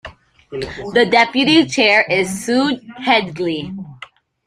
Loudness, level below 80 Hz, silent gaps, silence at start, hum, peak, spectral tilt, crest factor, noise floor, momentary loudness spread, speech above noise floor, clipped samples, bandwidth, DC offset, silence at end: -15 LUFS; -50 dBFS; none; 0.05 s; none; 0 dBFS; -4 dB/octave; 16 dB; -41 dBFS; 17 LU; 25 dB; under 0.1%; 15 kHz; under 0.1%; 0.4 s